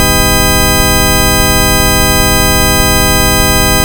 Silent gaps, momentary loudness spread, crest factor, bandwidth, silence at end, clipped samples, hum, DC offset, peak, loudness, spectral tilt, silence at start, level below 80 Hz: none; 0 LU; 8 dB; over 20 kHz; 0 s; under 0.1%; none; under 0.1%; 0 dBFS; -8 LUFS; -3 dB/octave; 0 s; -16 dBFS